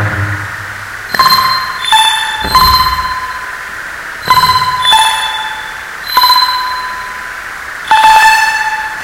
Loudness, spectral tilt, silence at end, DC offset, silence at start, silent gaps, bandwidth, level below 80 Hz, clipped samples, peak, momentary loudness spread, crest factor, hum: -9 LUFS; -1.5 dB/octave; 0 s; under 0.1%; 0 s; none; 18.5 kHz; -34 dBFS; 0.7%; 0 dBFS; 15 LU; 12 dB; none